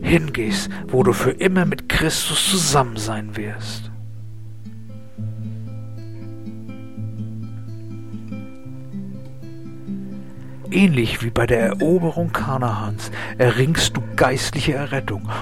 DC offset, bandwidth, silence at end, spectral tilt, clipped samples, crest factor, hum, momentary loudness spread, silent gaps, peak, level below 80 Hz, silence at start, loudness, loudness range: 2%; 16.5 kHz; 0 s; -4.5 dB/octave; under 0.1%; 18 dB; none; 19 LU; none; -2 dBFS; -40 dBFS; 0 s; -20 LUFS; 14 LU